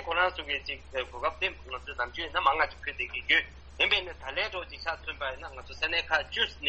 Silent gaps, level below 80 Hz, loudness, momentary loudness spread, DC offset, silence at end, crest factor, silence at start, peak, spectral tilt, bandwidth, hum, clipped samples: none; -50 dBFS; -30 LUFS; 11 LU; under 0.1%; 0 s; 22 dB; 0 s; -10 dBFS; -3 dB/octave; 8.2 kHz; none; under 0.1%